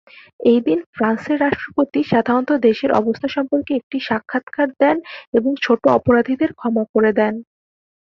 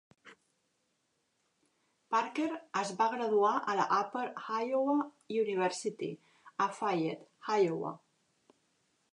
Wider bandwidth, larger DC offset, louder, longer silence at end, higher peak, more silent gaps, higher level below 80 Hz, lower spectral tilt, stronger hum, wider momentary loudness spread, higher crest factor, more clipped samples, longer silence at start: second, 6.6 kHz vs 11 kHz; neither; first, -18 LUFS vs -33 LUFS; second, 0.6 s vs 1.15 s; first, -2 dBFS vs -16 dBFS; first, 0.86-0.93 s, 3.83-3.90 s, 4.43-4.47 s, 5.27-5.32 s, 6.89-6.94 s vs none; first, -54 dBFS vs -88 dBFS; first, -7.5 dB/octave vs -5 dB/octave; neither; second, 7 LU vs 12 LU; about the same, 16 dB vs 18 dB; neither; first, 0.4 s vs 0.25 s